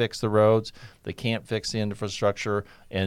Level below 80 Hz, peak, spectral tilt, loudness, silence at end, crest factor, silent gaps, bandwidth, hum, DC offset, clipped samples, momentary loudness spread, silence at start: -54 dBFS; -8 dBFS; -5.5 dB/octave; -26 LUFS; 0 s; 18 dB; none; 13.5 kHz; none; under 0.1%; under 0.1%; 15 LU; 0 s